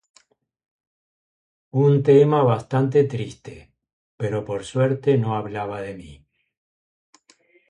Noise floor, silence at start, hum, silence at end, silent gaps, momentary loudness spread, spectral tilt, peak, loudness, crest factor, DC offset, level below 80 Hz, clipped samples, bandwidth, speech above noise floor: -60 dBFS; 1.75 s; none; 1.55 s; 3.93-4.18 s; 19 LU; -8 dB/octave; -4 dBFS; -20 LUFS; 18 dB; under 0.1%; -58 dBFS; under 0.1%; 10 kHz; 40 dB